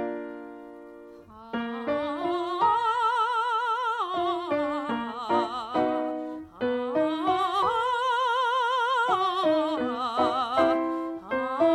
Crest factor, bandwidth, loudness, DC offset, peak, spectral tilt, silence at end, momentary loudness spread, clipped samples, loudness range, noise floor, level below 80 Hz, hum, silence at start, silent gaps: 16 dB; 12 kHz; -26 LUFS; under 0.1%; -10 dBFS; -4.5 dB/octave; 0 s; 10 LU; under 0.1%; 3 LU; -47 dBFS; -64 dBFS; none; 0 s; none